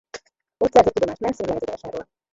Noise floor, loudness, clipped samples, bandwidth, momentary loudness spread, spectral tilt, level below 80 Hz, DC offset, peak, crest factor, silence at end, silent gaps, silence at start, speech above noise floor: -43 dBFS; -21 LUFS; under 0.1%; 7.8 kHz; 20 LU; -5.5 dB/octave; -50 dBFS; under 0.1%; 0 dBFS; 22 dB; 0.3 s; none; 0.15 s; 22 dB